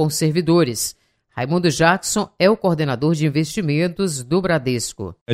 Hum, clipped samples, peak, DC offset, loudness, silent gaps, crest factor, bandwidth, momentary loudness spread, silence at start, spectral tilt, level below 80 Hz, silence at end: none; under 0.1%; -2 dBFS; under 0.1%; -19 LUFS; 5.21-5.26 s; 18 dB; 16 kHz; 8 LU; 0 s; -5 dB/octave; -50 dBFS; 0 s